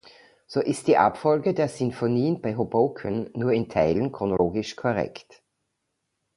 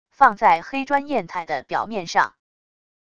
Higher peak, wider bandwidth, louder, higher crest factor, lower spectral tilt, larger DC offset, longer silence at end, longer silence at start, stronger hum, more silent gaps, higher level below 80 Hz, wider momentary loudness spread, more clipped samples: second, -4 dBFS vs 0 dBFS; first, 11.5 kHz vs 8.6 kHz; second, -25 LUFS vs -21 LUFS; about the same, 20 dB vs 22 dB; first, -7 dB/octave vs -4 dB/octave; second, under 0.1% vs 0.5%; first, 1.15 s vs 0.8 s; first, 0.5 s vs 0.2 s; neither; neither; first, -54 dBFS vs -60 dBFS; second, 7 LU vs 10 LU; neither